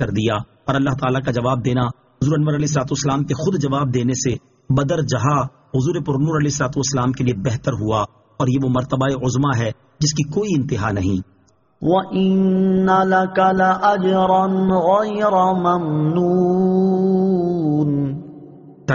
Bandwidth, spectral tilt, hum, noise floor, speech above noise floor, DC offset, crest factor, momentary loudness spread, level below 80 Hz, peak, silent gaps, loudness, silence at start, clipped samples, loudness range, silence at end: 7.4 kHz; -6.5 dB/octave; none; -41 dBFS; 23 dB; under 0.1%; 14 dB; 7 LU; -46 dBFS; -4 dBFS; none; -18 LUFS; 0 s; under 0.1%; 4 LU; 0 s